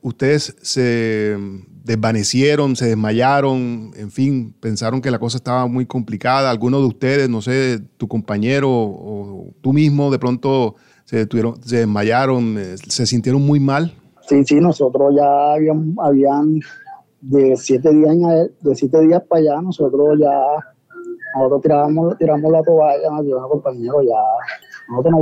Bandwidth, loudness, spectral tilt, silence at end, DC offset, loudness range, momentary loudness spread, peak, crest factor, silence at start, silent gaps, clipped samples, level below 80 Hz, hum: 11 kHz; -16 LUFS; -6.5 dB/octave; 0 s; under 0.1%; 4 LU; 11 LU; -2 dBFS; 12 dB; 0.05 s; none; under 0.1%; -58 dBFS; none